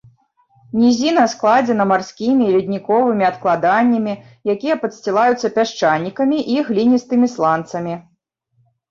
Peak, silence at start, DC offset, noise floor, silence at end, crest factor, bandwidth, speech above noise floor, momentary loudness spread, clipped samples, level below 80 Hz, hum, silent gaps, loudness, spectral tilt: -2 dBFS; 0.75 s; under 0.1%; -64 dBFS; 0.9 s; 14 dB; 7.4 kHz; 48 dB; 7 LU; under 0.1%; -62 dBFS; none; none; -17 LUFS; -5.5 dB/octave